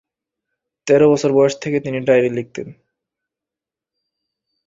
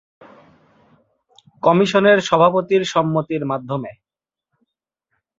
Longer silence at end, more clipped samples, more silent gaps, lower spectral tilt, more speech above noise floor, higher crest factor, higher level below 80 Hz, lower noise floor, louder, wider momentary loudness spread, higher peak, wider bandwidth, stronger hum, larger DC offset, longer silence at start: first, 1.95 s vs 1.45 s; neither; neither; about the same, -6 dB/octave vs -5.5 dB/octave; first, 72 dB vs 65 dB; about the same, 18 dB vs 18 dB; about the same, -60 dBFS vs -62 dBFS; first, -87 dBFS vs -82 dBFS; about the same, -16 LUFS vs -17 LUFS; first, 19 LU vs 12 LU; about the same, -2 dBFS vs -2 dBFS; about the same, 7.8 kHz vs 7.8 kHz; neither; neither; second, 0.85 s vs 1.65 s